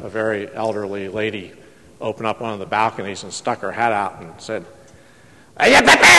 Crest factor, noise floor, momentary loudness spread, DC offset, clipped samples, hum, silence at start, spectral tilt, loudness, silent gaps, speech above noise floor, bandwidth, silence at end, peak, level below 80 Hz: 18 dB; -48 dBFS; 18 LU; 0.2%; under 0.1%; none; 0 s; -2 dB/octave; -19 LUFS; none; 31 dB; 12.5 kHz; 0 s; 0 dBFS; -52 dBFS